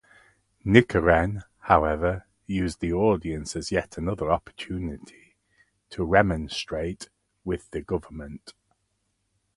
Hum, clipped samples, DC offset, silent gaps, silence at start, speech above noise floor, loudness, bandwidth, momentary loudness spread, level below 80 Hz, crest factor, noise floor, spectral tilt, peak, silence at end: none; under 0.1%; under 0.1%; none; 0.65 s; 50 dB; -25 LUFS; 11.5 kHz; 19 LU; -42 dBFS; 26 dB; -75 dBFS; -6 dB/octave; 0 dBFS; 1.05 s